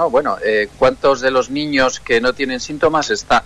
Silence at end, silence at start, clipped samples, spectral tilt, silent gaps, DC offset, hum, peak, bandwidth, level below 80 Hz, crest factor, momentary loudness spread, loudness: 0 s; 0 s; under 0.1%; -3.5 dB/octave; none; under 0.1%; none; -4 dBFS; 10.5 kHz; -42 dBFS; 12 dB; 4 LU; -16 LUFS